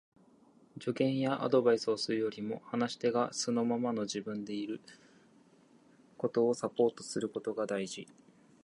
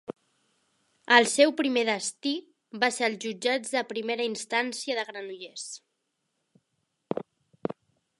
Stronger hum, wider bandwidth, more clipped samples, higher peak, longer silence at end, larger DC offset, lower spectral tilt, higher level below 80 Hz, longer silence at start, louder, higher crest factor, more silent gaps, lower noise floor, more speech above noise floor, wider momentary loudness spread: neither; about the same, 11.5 kHz vs 11.5 kHz; neither; second, -14 dBFS vs -2 dBFS; first, 0.6 s vs 0.45 s; neither; first, -5 dB/octave vs -2 dB/octave; about the same, -80 dBFS vs -80 dBFS; first, 0.75 s vs 0.1 s; second, -33 LUFS vs -27 LUFS; second, 20 dB vs 28 dB; neither; second, -63 dBFS vs -79 dBFS; second, 30 dB vs 52 dB; second, 11 LU vs 18 LU